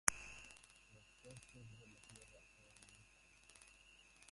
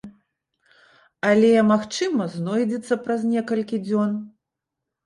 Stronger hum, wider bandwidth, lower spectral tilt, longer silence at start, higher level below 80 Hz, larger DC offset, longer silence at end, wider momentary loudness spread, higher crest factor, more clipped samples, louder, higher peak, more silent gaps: neither; about the same, 11.5 kHz vs 11 kHz; second, -0.5 dB/octave vs -6 dB/octave; about the same, 0.05 s vs 0.05 s; about the same, -72 dBFS vs -68 dBFS; neither; second, 0 s vs 0.75 s; about the same, 10 LU vs 9 LU; first, 44 dB vs 16 dB; neither; second, -53 LUFS vs -22 LUFS; about the same, -8 dBFS vs -6 dBFS; neither